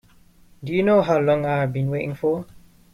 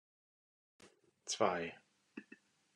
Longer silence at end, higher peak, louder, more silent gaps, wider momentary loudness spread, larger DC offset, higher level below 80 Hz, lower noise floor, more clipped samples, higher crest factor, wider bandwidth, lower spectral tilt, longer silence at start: about the same, 0.5 s vs 0.55 s; first, -6 dBFS vs -18 dBFS; first, -21 LUFS vs -38 LUFS; neither; second, 9 LU vs 24 LU; neither; first, -54 dBFS vs -84 dBFS; second, -52 dBFS vs -65 dBFS; neither; second, 16 dB vs 26 dB; first, 13.5 kHz vs 11.5 kHz; first, -8.5 dB/octave vs -3 dB/octave; second, 0.6 s vs 0.8 s